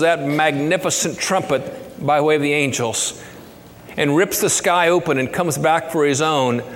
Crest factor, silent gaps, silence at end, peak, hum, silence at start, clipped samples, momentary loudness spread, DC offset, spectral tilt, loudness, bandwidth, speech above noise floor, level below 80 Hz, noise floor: 16 dB; none; 0 s; -2 dBFS; none; 0 s; under 0.1%; 7 LU; under 0.1%; -3.5 dB/octave; -18 LUFS; 17.5 kHz; 23 dB; -56 dBFS; -40 dBFS